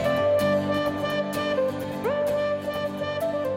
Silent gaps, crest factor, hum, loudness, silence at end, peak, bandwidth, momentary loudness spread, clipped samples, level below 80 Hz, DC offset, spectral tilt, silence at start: none; 12 dB; none; -26 LUFS; 0 s; -12 dBFS; 16.5 kHz; 6 LU; under 0.1%; -58 dBFS; under 0.1%; -6 dB/octave; 0 s